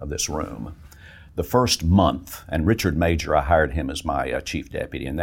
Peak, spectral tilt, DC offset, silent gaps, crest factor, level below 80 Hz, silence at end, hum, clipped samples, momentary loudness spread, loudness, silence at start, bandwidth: -4 dBFS; -5 dB/octave; under 0.1%; none; 20 dB; -34 dBFS; 0 s; none; under 0.1%; 13 LU; -23 LUFS; 0 s; 17 kHz